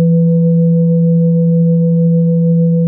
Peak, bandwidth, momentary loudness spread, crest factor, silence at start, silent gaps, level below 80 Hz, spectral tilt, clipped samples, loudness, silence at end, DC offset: -4 dBFS; 1 kHz; 1 LU; 6 dB; 0 s; none; -64 dBFS; -16.5 dB/octave; under 0.1%; -11 LUFS; 0 s; under 0.1%